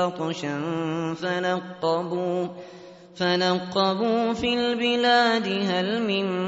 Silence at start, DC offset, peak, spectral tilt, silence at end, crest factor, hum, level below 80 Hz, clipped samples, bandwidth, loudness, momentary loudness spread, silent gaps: 0 s; under 0.1%; -8 dBFS; -3 dB/octave; 0 s; 16 dB; none; -62 dBFS; under 0.1%; 8 kHz; -24 LUFS; 9 LU; none